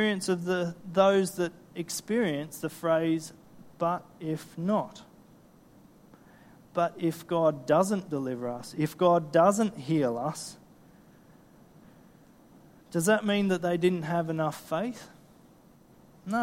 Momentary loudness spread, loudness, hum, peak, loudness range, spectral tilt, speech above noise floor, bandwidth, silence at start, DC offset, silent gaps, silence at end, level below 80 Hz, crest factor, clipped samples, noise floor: 12 LU; -28 LUFS; none; -10 dBFS; 8 LU; -5.5 dB/octave; 29 dB; 16.5 kHz; 0 s; under 0.1%; none; 0 s; -68 dBFS; 20 dB; under 0.1%; -57 dBFS